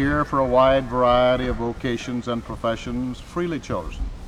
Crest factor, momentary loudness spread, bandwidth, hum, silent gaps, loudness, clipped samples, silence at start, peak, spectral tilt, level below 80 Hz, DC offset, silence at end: 16 dB; 11 LU; 11.5 kHz; none; none; -22 LUFS; under 0.1%; 0 s; -6 dBFS; -6.5 dB/octave; -36 dBFS; under 0.1%; 0 s